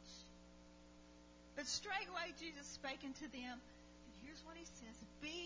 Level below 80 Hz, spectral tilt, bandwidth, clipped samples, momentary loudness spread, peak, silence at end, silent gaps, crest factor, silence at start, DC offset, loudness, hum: -70 dBFS; -2 dB/octave; 7.8 kHz; under 0.1%; 20 LU; -30 dBFS; 0 s; none; 22 dB; 0 s; under 0.1%; -49 LUFS; 60 Hz at -65 dBFS